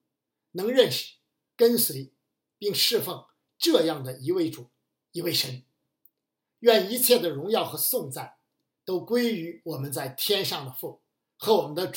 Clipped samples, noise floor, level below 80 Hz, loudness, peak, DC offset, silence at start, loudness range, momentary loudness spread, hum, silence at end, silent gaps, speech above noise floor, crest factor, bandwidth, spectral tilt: under 0.1%; -83 dBFS; -82 dBFS; -25 LUFS; -6 dBFS; under 0.1%; 0.55 s; 4 LU; 18 LU; none; 0 s; none; 58 dB; 22 dB; 17 kHz; -3.5 dB/octave